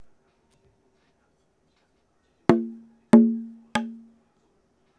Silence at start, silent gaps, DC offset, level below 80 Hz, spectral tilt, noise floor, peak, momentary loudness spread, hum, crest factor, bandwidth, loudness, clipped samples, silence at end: 2.5 s; none; under 0.1%; -64 dBFS; -7 dB/octave; -68 dBFS; 0 dBFS; 18 LU; none; 26 dB; 10.5 kHz; -22 LUFS; under 0.1%; 1.05 s